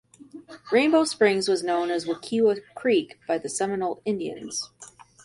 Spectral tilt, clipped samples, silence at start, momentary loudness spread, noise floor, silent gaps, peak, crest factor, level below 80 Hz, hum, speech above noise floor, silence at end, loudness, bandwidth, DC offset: -4 dB/octave; under 0.1%; 0.2 s; 12 LU; -49 dBFS; none; -6 dBFS; 20 dB; -70 dBFS; none; 25 dB; 0.4 s; -25 LUFS; 11.5 kHz; under 0.1%